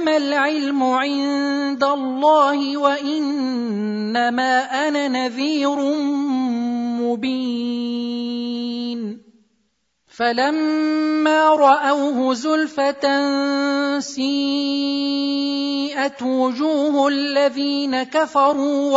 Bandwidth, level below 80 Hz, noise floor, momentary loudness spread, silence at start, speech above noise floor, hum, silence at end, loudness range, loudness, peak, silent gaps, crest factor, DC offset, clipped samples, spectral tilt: 7.8 kHz; -72 dBFS; -69 dBFS; 7 LU; 0 s; 50 dB; none; 0 s; 6 LU; -19 LUFS; -2 dBFS; none; 16 dB; under 0.1%; under 0.1%; -4 dB/octave